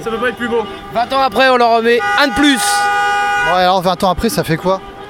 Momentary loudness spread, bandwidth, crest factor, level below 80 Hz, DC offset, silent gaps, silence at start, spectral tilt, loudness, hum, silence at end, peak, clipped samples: 7 LU; 17.5 kHz; 14 dB; -38 dBFS; under 0.1%; none; 0 s; -3.5 dB/octave; -13 LUFS; none; 0 s; 0 dBFS; under 0.1%